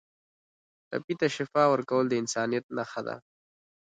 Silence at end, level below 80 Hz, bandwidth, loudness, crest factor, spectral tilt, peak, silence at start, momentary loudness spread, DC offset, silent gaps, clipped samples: 0.65 s; -76 dBFS; 9.4 kHz; -29 LUFS; 20 dB; -4.5 dB/octave; -10 dBFS; 0.9 s; 13 LU; under 0.1%; 1.04-1.08 s, 2.63-2.69 s; under 0.1%